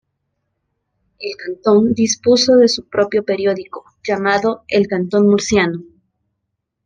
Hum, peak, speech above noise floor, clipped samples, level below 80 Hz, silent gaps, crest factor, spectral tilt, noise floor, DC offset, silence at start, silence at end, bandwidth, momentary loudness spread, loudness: none; -2 dBFS; 60 dB; under 0.1%; -54 dBFS; none; 14 dB; -4.5 dB/octave; -75 dBFS; under 0.1%; 1.2 s; 1.05 s; 9.8 kHz; 15 LU; -15 LUFS